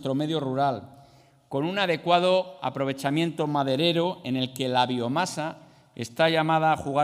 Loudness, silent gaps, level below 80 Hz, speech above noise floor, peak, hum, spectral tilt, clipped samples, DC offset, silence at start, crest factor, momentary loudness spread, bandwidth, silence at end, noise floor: -25 LUFS; none; -68 dBFS; 31 dB; -6 dBFS; none; -5.5 dB/octave; under 0.1%; under 0.1%; 0 s; 20 dB; 10 LU; 15.5 kHz; 0 s; -56 dBFS